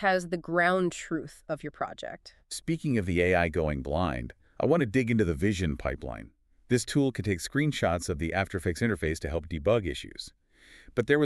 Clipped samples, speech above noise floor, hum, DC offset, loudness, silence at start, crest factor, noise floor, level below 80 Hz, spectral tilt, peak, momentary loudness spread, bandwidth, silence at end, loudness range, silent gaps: under 0.1%; 28 dB; none; under 0.1%; -29 LUFS; 0 s; 18 dB; -56 dBFS; -46 dBFS; -6 dB/octave; -10 dBFS; 13 LU; 13.5 kHz; 0 s; 3 LU; none